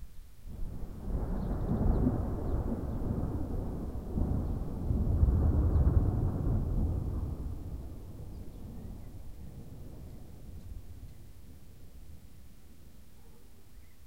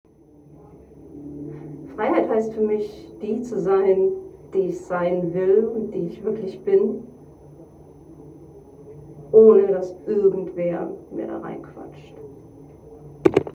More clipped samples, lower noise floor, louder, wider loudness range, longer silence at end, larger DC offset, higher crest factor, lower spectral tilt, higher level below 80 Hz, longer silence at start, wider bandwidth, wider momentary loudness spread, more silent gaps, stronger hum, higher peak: neither; first, -56 dBFS vs -50 dBFS; second, -33 LUFS vs -21 LUFS; first, 20 LU vs 7 LU; about the same, 0 s vs 0.05 s; first, 0.4% vs under 0.1%; about the same, 20 dB vs 22 dB; first, -10 dB/octave vs -8.5 dB/octave; first, -36 dBFS vs -56 dBFS; second, 0 s vs 1 s; first, 16 kHz vs 8 kHz; first, 25 LU vs 22 LU; neither; neither; second, -12 dBFS vs 0 dBFS